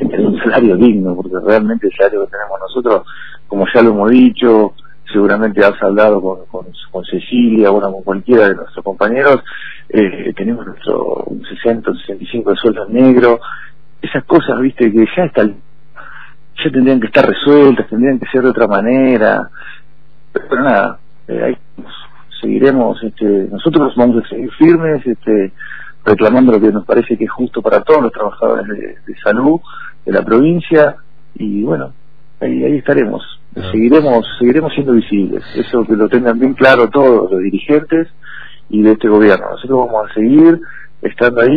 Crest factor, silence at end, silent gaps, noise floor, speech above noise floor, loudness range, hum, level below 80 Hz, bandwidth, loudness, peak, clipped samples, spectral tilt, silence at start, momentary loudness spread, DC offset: 12 dB; 0 s; none; -49 dBFS; 38 dB; 4 LU; none; -48 dBFS; 5.4 kHz; -12 LUFS; 0 dBFS; 0.5%; -9.5 dB/octave; 0 s; 15 LU; 3%